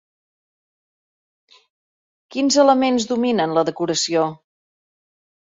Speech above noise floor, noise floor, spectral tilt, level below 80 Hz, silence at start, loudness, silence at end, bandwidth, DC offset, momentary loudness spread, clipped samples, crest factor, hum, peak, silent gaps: over 72 dB; under -90 dBFS; -3.5 dB/octave; -66 dBFS; 2.3 s; -18 LUFS; 1.25 s; 7.8 kHz; under 0.1%; 8 LU; under 0.1%; 20 dB; none; -2 dBFS; none